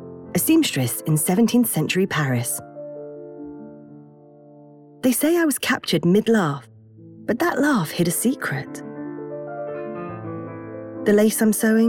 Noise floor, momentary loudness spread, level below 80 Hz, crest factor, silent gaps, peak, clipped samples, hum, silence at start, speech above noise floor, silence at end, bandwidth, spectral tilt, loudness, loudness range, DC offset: -47 dBFS; 18 LU; -62 dBFS; 16 dB; none; -6 dBFS; under 0.1%; none; 0 s; 28 dB; 0 s; 18 kHz; -5 dB/octave; -21 LUFS; 6 LU; under 0.1%